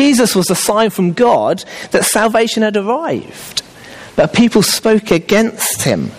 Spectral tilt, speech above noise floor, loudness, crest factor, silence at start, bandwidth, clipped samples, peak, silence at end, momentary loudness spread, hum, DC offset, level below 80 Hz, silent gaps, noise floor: -4 dB/octave; 22 dB; -13 LUFS; 12 dB; 0 s; 15.5 kHz; under 0.1%; -2 dBFS; 0 s; 11 LU; none; under 0.1%; -46 dBFS; none; -35 dBFS